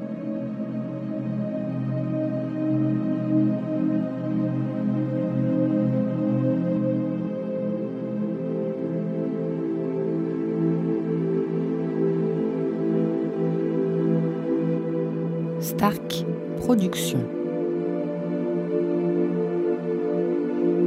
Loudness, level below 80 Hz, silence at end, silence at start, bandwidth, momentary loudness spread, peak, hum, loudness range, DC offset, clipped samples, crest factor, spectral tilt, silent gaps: -25 LUFS; -64 dBFS; 0 s; 0 s; 16 kHz; 5 LU; -6 dBFS; none; 2 LU; under 0.1%; under 0.1%; 18 dB; -7.5 dB/octave; none